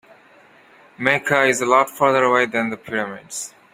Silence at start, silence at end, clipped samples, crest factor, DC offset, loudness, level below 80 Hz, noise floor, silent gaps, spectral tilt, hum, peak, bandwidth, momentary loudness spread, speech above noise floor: 1 s; 0.25 s; under 0.1%; 20 dB; under 0.1%; -18 LUFS; -64 dBFS; -50 dBFS; none; -3.5 dB/octave; none; 0 dBFS; 16 kHz; 13 LU; 31 dB